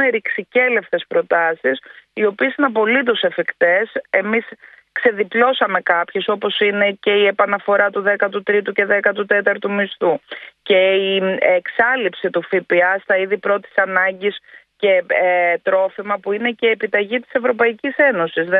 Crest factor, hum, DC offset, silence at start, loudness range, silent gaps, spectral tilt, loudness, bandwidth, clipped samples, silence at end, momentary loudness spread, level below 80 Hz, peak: 16 dB; none; under 0.1%; 0 s; 1 LU; none; -7.5 dB/octave; -17 LUFS; 4.7 kHz; under 0.1%; 0 s; 6 LU; -68 dBFS; 0 dBFS